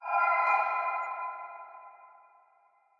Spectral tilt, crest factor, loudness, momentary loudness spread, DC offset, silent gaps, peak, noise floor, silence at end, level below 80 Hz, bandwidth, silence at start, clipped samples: -1.5 dB/octave; 18 dB; -29 LUFS; 22 LU; under 0.1%; none; -14 dBFS; -66 dBFS; 0.95 s; under -90 dBFS; 7.4 kHz; 0 s; under 0.1%